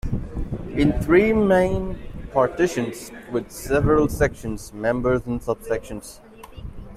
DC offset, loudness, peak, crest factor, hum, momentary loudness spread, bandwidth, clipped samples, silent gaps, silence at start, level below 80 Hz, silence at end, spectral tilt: under 0.1%; -22 LUFS; -4 dBFS; 18 dB; none; 18 LU; 15.5 kHz; under 0.1%; none; 0.05 s; -34 dBFS; 0 s; -6.5 dB/octave